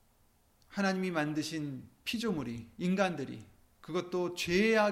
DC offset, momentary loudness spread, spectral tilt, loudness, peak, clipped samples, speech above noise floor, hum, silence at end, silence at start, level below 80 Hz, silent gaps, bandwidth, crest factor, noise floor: under 0.1%; 13 LU; -5 dB/octave; -34 LUFS; -16 dBFS; under 0.1%; 36 dB; none; 0 s; 0.7 s; -64 dBFS; none; 16 kHz; 18 dB; -68 dBFS